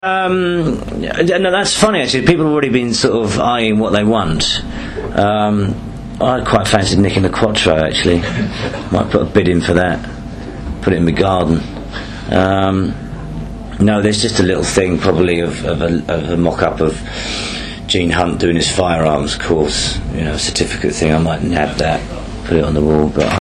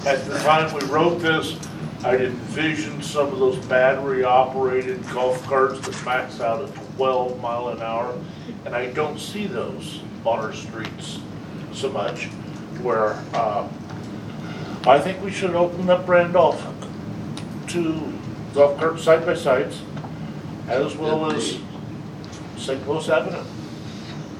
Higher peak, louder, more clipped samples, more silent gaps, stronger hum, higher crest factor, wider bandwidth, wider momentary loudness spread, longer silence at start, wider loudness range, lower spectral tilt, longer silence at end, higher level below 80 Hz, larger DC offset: about the same, 0 dBFS vs -2 dBFS; first, -15 LUFS vs -22 LUFS; neither; neither; neither; second, 14 dB vs 22 dB; second, 12.5 kHz vs 14.5 kHz; second, 10 LU vs 15 LU; about the same, 0.05 s vs 0 s; second, 3 LU vs 7 LU; about the same, -5 dB/octave vs -5.5 dB/octave; about the same, 0.05 s vs 0 s; first, -30 dBFS vs -56 dBFS; neither